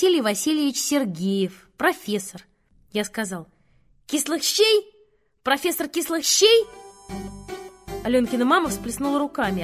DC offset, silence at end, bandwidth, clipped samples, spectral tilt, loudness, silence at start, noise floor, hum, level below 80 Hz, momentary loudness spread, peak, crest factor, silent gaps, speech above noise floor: under 0.1%; 0 s; 16 kHz; under 0.1%; -3 dB/octave; -22 LUFS; 0 s; -61 dBFS; none; -52 dBFS; 18 LU; -2 dBFS; 20 dB; none; 39 dB